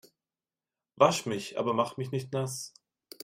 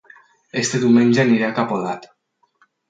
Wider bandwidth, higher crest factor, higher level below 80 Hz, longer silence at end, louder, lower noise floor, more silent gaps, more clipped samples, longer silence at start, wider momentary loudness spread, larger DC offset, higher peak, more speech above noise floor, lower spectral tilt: first, 16 kHz vs 9.2 kHz; first, 24 dB vs 16 dB; second, -74 dBFS vs -64 dBFS; second, 0.55 s vs 0.85 s; second, -30 LUFS vs -18 LUFS; first, under -90 dBFS vs -61 dBFS; neither; neither; first, 0.95 s vs 0.55 s; second, 11 LU vs 14 LU; neither; second, -8 dBFS vs -4 dBFS; first, over 61 dB vs 44 dB; about the same, -4.5 dB/octave vs -5 dB/octave